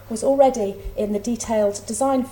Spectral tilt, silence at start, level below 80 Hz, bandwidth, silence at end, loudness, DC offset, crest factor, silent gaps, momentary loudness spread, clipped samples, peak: -5 dB/octave; 0 s; -42 dBFS; 17 kHz; 0 s; -21 LUFS; under 0.1%; 18 dB; none; 10 LU; under 0.1%; -4 dBFS